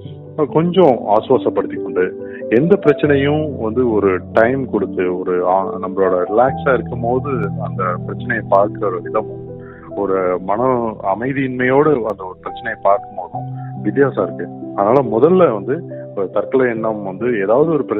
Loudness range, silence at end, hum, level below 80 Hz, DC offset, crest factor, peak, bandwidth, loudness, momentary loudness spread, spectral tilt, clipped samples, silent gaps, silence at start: 3 LU; 0 s; none; -50 dBFS; under 0.1%; 16 dB; 0 dBFS; 4.4 kHz; -16 LUFS; 12 LU; -6.5 dB/octave; under 0.1%; none; 0 s